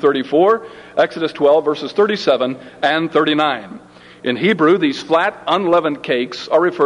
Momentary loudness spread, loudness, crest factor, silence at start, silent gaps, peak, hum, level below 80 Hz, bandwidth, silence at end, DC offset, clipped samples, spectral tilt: 6 LU; -16 LUFS; 14 dB; 0 s; none; -2 dBFS; none; -62 dBFS; 10.5 kHz; 0 s; under 0.1%; under 0.1%; -5.5 dB/octave